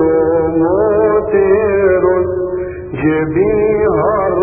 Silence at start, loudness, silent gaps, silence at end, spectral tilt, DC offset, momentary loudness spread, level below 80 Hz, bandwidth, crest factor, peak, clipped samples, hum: 0 s; -13 LUFS; none; 0 s; -13 dB/octave; under 0.1%; 6 LU; -36 dBFS; 3.4 kHz; 12 dB; -2 dBFS; under 0.1%; none